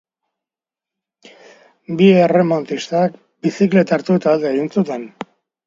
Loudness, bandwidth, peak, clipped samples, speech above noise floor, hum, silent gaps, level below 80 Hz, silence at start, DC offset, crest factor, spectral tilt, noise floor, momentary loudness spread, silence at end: -16 LUFS; 7.6 kHz; 0 dBFS; under 0.1%; 73 dB; none; none; -64 dBFS; 1.9 s; under 0.1%; 16 dB; -7.5 dB/octave; -88 dBFS; 15 LU; 0.6 s